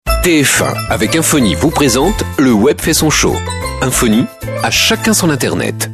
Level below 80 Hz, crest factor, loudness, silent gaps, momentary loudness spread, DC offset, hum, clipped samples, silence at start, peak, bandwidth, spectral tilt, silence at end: -26 dBFS; 12 dB; -12 LUFS; none; 6 LU; under 0.1%; none; under 0.1%; 0.05 s; 0 dBFS; 13.5 kHz; -3.5 dB/octave; 0 s